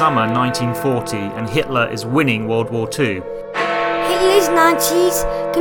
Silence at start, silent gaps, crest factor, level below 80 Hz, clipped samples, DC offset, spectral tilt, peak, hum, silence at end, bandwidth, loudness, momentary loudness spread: 0 s; none; 16 dB; -40 dBFS; under 0.1%; under 0.1%; -4.5 dB/octave; 0 dBFS; none; 0 s; 19 kHz; -17 LUFS; 8 LU